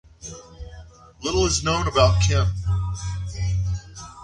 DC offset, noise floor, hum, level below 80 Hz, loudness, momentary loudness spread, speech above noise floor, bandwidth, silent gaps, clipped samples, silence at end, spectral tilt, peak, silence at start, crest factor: under 0.1%; -44 dBFS; none; -32 dBFS; -22 LUFS; 22 LU; 24 dB; 10.5 kHz; none; under 0.1%; 0 s; -4.5 dB/octave; -4 dBFS; 0.2 s; 20 dB